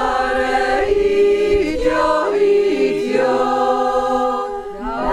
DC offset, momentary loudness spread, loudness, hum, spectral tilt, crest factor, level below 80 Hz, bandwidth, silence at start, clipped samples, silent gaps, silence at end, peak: under 0.1%; 6 LU; -17 LUFS; none; -5 dB/octave; 12 dB; -36 dBFS; 11 kHz; 0 s; under 0.1%; none; 0 s; -4 dBFS